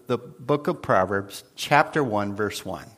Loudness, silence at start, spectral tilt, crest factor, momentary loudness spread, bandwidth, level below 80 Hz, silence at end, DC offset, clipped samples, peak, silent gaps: -24 LUFS; 0.1 s; -5 dB/octave; 22 dB; 11 LU; 15.5 kHz; -60 dBFS; 0.1 s; under 0.1%; under 0.1%; -2 dBFS; none